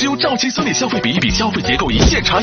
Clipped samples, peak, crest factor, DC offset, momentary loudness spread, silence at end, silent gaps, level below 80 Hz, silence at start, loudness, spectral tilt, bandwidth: under 0.1%; 0 dBFS; 16 dB; under 0.1%; 4 LU; 0 s; none; -26 dBFS; 0 s; -15 LUFS; -4 dB/octave; 7.2 kHz